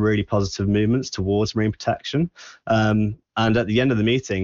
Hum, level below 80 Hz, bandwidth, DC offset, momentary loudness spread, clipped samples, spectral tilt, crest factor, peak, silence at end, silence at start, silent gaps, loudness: none; -46 dBFS; 7.6 kHz; under 0.1%; 6 LU; under 0.1%; -6.5 dB/octave; 12 dB; -8 dBFS; 0 s; 0 s; none; -21 LUFS